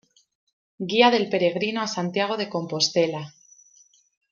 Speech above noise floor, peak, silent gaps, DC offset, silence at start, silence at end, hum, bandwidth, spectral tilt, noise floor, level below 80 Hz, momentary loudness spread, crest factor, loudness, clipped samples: 35 dB; -4 dBFS; none; under 0.1%; 0.8 s; 1 s; none; 7.4 kHz; -4 dB/octave; -58 dBFS; -74 dBFS; 12 LU; 20 dB; -23 LUFS; under 0.1%